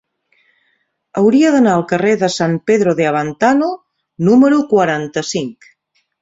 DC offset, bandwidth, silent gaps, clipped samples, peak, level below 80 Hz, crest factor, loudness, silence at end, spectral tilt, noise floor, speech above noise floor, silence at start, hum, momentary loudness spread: under 0.1%; 8 kHz; none; under 0.1%; -2 dBFS; -56 dBFS; 14 dB; -14 LUFS; 0.7 s; -6 dB/octave; -64 dBFS; 51 dB; 1.15 s; none; 11 LU